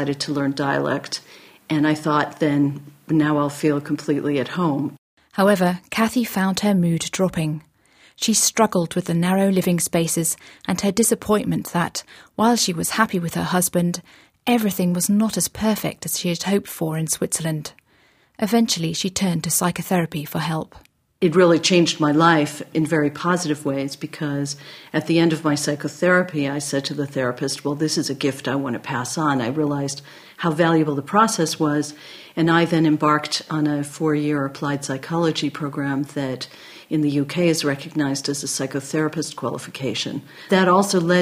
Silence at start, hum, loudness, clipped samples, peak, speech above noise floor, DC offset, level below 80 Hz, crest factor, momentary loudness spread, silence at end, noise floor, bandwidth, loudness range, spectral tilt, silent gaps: 0 s; none; -21 LUFS; under 0.1%; -2 dBFS; 37 dB; under 0.1%; -58 dBFS; 20 dB; 9 LU; 0 s; -58 dBFS; 15.5 kHz; 4 LU; -4.5 dB/octave; 4.98-5.17 s